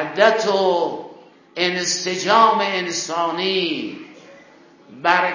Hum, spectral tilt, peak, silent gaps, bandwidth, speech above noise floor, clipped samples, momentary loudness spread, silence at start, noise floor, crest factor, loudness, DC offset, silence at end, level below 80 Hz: none; -2.5 dB/octave; 0 dBFS; none; 7.4 kHz; 29 dB; under 0.1%; 13 LU; 0 s; -48 dBFS; 20 dB; -19 LUFS; under 0.1%; 0 s; -70 dBFS